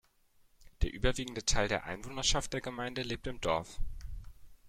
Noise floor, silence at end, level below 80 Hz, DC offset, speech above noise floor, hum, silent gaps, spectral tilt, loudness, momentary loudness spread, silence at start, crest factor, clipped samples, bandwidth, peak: -67 dBFS; 0 s; -42 dBFS; under 0.1%; 34 dB; none; none; -3 dB/octave; -34 LUFS; 15 LU; 0.6 s; 20 dB; under 0.1%; 14 kHz; -14 dBFS